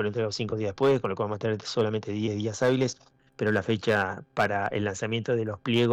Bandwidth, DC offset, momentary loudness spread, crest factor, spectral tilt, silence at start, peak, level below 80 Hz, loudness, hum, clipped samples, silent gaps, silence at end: 11 kHz; under 0.1%; 5 LU; 12 dB; -5.5 dB/octave; 0 s; -16 dBFS; -62 dBFS; -28 LUFS; none; under 0.1%; none; 0 s